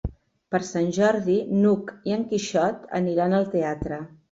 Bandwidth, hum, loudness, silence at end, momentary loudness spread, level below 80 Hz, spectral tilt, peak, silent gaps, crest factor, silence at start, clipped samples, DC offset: 7.8 kHz; none; -24 LUFS; 0.25 s; 8 LU; -46 dBFS; -6.5 dB/octave; -10 dBFS; none; 14 dB; 0.05 s; under 0.1%; under 0.1%